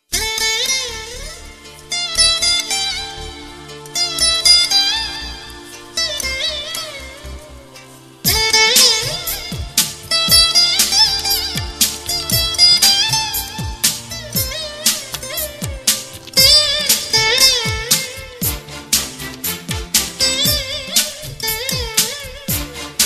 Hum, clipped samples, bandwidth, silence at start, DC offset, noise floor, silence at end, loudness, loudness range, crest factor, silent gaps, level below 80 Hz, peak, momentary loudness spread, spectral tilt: none; under 0.1%; 15.5 kHz; 0.1 s; under 0.1%; -40 dBFS; 0 s; -14 LUFS; 6 LU; 18 dB; none; -36 dBFS; 0 dBFS; 17 LU; -0.5 dB/octave